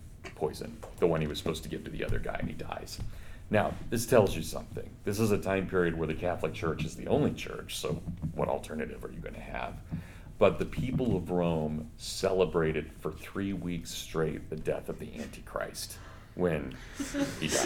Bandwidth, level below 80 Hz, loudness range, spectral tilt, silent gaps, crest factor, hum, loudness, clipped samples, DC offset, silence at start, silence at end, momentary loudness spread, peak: 18 kHz; -46 dBFS; 5 LU; -5.5 dB/octave; none; 24 dB; none; -33 LUFS; under 0.1%; under 0.1%; 0 s; 0 s; 14 LU; -8 dBFS